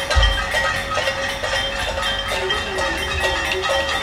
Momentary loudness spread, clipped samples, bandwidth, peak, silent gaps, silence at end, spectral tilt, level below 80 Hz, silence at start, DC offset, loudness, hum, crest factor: 4 LU; under 0.1%; 16 kHz; -4 dBFS; none; 0 s; -3 dB/octave; -28 dBFS; 0 s; under 0.1%; -20 LUFS; none; 16 dB